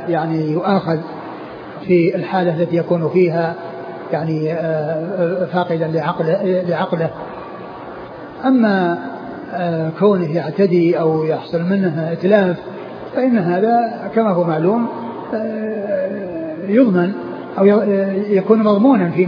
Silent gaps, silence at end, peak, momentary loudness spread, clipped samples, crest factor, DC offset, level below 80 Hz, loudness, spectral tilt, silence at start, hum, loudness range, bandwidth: none; 0 s; 0 dBFS; 16 LU; under 0.1%; 16 dB; under 0.1%; -62 dBFS; -17 LUFS; -10 dB/octave; 0 s; none; 3 LU; 5.2 kHz